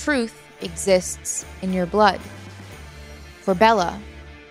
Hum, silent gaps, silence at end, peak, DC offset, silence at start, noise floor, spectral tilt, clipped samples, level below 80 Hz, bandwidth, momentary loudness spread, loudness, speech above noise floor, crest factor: none; none; 0.05 s; -2 dBFS; under 0.1%; 0 s; -40 dBFS; -4 dB/octave; under 0.1%; -44 dBFS; 16 kHz; 23 LU; -21 LUFS; 19 dB; 22 dB